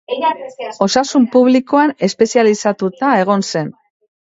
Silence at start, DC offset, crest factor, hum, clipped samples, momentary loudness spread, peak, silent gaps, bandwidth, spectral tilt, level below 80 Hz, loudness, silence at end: 0.1 s; under 0.1%; 14 dB; none; under 0.1%; 9 LU; 0 dBFS; none; 8 kHz; -5 dB/octave; -60 dBFS; -14 LUFS; 0.65 s